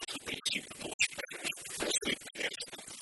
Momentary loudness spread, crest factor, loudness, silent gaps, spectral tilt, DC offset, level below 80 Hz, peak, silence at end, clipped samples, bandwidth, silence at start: 8 LU; 22 dB; -35 LUFS; 0.94-0.99 s; -0.5 dB/octave; under 0.1%; -66 dBFS; -16 dBFS; 0 s; under 0.1%; 15 kHz; 0 s